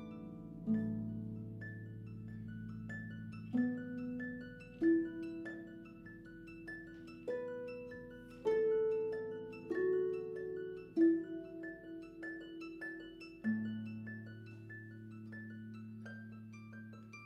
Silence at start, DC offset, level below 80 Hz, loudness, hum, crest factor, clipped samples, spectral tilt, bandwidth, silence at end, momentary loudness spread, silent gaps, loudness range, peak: 0 s; under 0.1%; -68 dBFS; -41 LUFS; none; 20 dB; under 0.1%; -9 dB/octave; 7 kHz; 0 s; 18 LU; none; 8 LU; -22 dBFS